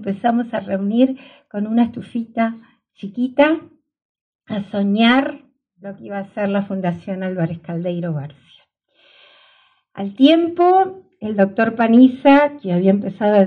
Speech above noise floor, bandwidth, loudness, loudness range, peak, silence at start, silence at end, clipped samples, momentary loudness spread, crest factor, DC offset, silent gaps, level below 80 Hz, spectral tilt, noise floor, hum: 41 dB; 4.9 kHz; -17 LUFS; 10 LU; 0 dBFS; 0 s; 0 s; under 0.1%; 17 LU; 18 dB; under 0.1%; 4.05-4.15 s, 4.21-4.39 s; -64 dBFS; -8.5 dB/octave; -58 dBFS; none